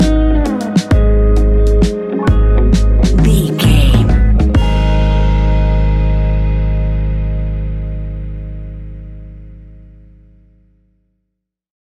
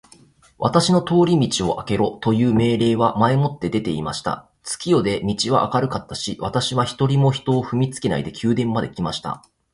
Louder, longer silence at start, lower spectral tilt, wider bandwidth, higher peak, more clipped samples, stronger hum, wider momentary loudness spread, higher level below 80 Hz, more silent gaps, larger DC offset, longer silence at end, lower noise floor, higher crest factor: first, -13 LUFS vs -20 LUFS; second, 0 s vs 0.6 s; about the same, -7 dB/octave vs -6 dB/octave; about the same, 12.5 kHz vs 11.5 kHz; about the same, 0 dBFS vs -2 dBFS; neither; neither; first, 15 LU vs 9 LU; first, -14 dBFS vs -48 dBFS; neither; neither; first, 2.05 s vs 0.35 s; first, -73 dBFS vs -51 dBFS; second, 12 dB vs 18 dB